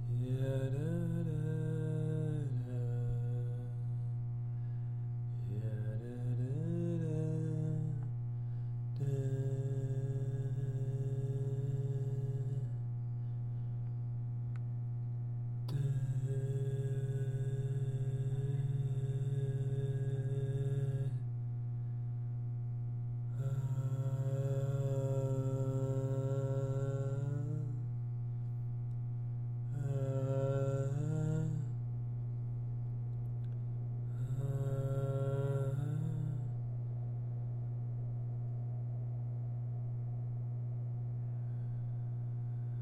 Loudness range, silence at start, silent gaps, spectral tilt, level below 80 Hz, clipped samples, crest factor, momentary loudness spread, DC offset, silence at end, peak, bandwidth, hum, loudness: 3 LU; 0 s; none; -9.5 dB/octave; -56 dBFS; under 0.1%; 12 dB; 4 LU; under 0.1%; 0 s; -24 dBFS; 8.4 kHz; 60 Hz at -40 dBFS; -38 LUFS